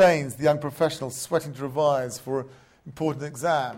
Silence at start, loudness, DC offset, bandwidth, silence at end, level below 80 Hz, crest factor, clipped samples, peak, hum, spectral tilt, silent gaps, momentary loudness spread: 0 s; -26 LUFS; under 0.1%; 16.5 kHz; 0 s; -62 dBFS; 16 dB; under 0.1%; -8 dBFS; none; -5 dB/octave; none; 8 LU